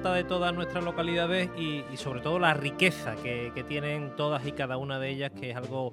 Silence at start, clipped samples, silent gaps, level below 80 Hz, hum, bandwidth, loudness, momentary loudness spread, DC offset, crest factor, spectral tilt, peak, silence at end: 0 s; under 0.1%; none; -56 dBFS; none; 15.5 kHz; -30 LUFS; 9 LU; under 0.1%; 22 dB; -5.5 dB/octave; -8 dBFS; 0 s